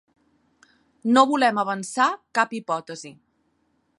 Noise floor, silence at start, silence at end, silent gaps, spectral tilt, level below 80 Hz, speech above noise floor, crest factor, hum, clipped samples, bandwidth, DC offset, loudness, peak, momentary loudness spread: -69 dBFS; 1.05 s; 0.85 s; none; -3.5 dB/octave; -78 dBFS; 47 dB; 22 dB; none; under 0.1%; 11.5 kHz; under 0.1%; -22 LUFS; -2 dBFS; 18 LU